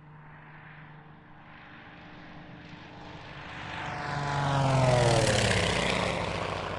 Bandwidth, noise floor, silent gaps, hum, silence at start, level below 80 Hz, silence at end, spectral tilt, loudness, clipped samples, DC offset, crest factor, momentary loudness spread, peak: 11.5 kHz; -51 dBFS; none; none; 0 s; -48 dBFS; 0 s; -4.5 dB/octave; -27 LUFS; under 0.1%; under 0.1%; 18 dB; 25 LU; -12 dBFS